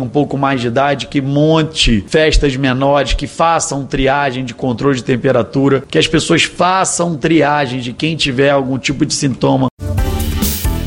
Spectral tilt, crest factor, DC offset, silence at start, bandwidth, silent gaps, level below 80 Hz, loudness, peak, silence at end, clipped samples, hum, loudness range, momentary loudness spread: -4.5 dB/octave; 12 dB; under 0.1%; 0 s; 17 kHz; 9.71-9.77 s; -26 dBFS; -14 LUFS; -2 dBFS; 0 s; under 0.1%; none; 1 LU; 6 LU